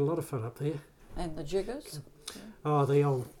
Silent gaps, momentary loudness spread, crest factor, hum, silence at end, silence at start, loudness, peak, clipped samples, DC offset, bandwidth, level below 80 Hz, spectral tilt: none; 18 LU; 16 dB; none; 0 s; 0 s; -32 LUFS; -16 dBFS; under 0.1%; under 0.1%; 16 kHz; -50 dBFS; -7 dB/octave